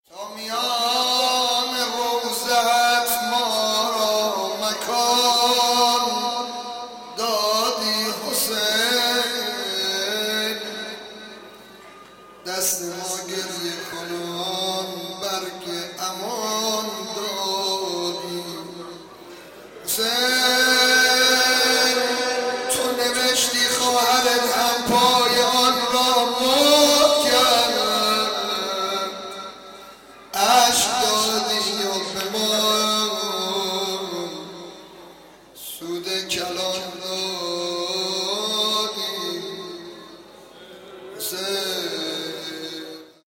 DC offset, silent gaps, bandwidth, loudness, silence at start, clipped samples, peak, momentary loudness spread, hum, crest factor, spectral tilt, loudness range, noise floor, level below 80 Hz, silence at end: under 0.1%; none; 17 kHz; -20 LUFS; 0.1 s; under 0.1%; -4 dBFS; 17 LU; none; 18 dB; -1 dB/octave; 11 LU; -46 dBFS; -60 dBFS; 0.2 s